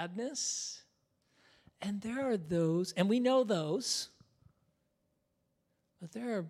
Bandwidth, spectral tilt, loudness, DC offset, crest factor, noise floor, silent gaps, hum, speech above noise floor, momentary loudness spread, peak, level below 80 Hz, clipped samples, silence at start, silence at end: 15 kHz; -4.5 dB/octave; -34 LUFS; under 0.1%; 20 dB; -80 dBFS; none; none; 46 dB; 15 LU; -16 dBFS; -76 dBFS; under 0.1%; 0 s; 0 s